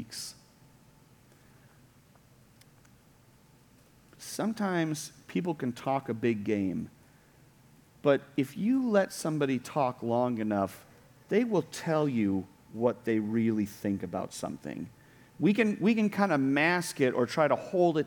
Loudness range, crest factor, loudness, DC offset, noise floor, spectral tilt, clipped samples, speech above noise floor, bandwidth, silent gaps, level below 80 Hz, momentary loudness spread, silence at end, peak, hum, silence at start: 8 LU; 20 dB; -30 LUFS; under 0.1%; -60 dBFS; -6 dB/octave; under 0.1%; 31 dB; 19 kHz; none; -70 dBFS; 12 LU; 0 s; -12 dBFS; none; 0 s